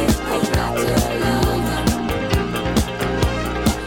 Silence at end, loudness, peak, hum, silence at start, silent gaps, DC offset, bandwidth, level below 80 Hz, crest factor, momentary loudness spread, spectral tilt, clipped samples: 0 s; -20 LUFS; -4 dBFS; none; 0 s; none; under 0.1%; over 20 kHz; -28 dBFS; 16 dB; 2 LU; -5 dB/octave; under 0.1%